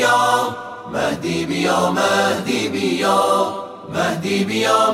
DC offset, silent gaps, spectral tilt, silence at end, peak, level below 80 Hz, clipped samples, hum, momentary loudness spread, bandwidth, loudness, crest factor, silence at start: under 0.1%; none; -4 dB/octave; 0 s; -2 dBFS; -56 dBFS; under 0.1%; none; 9 LU; 16.5 kHz; -18 LUFS; 16 dB; 0 s